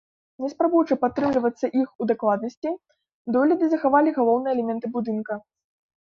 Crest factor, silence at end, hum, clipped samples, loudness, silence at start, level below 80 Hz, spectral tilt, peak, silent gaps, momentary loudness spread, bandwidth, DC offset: 18 dB; 0.65 s; none; under 0.1%; -23 LUFS; 0.4 s; -64 dBFS; -7.5 dB/octave; -6 dBFS; 1.95-1.99 s, 2.57-2.62 s, 3.14-3.25 s; 13 LU; 7 kHz; under 0.1%